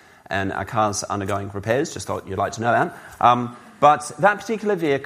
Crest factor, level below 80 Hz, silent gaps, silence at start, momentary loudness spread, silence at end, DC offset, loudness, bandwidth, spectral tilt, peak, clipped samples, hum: 20 dB; -56 dBFS; none; 0.3 s; 9 LU; 0 s; under 0.1%; -21 LUFS; 15.5 kHz; -4.5 dB/octave; -2 dBFS; under 0.1%; none